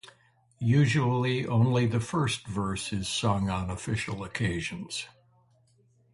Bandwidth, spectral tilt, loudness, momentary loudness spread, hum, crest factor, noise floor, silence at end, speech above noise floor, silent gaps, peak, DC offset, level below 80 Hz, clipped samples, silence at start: 11.5 kHz; -5.5 dB/octave; -28 LUFS; 10 LU; none; 16 dB; -65 dBFS; 1.05 s; 37 dB; none; -12 dBFS; under 0.1%; -50 dBFS; under 0.1%; 0.05 s